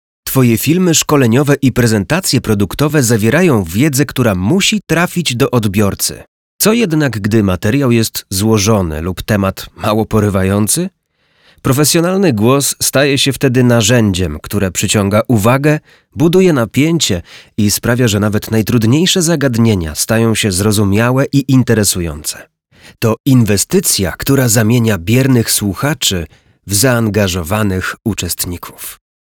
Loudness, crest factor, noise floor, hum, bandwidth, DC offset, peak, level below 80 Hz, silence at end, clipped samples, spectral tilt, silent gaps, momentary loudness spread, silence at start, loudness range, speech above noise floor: -12 LUFS; 12 dB; -57 dBFS; none; 20 kHz; under 0.1%; 0 dBFS; -36 dBFS; 0.3 s; under 0.1%; -4.5 dB/octave; 6.28-6.59 s, 23.20-23.24 s; 7 LU; 0.25 s; 2 LU; 45 dB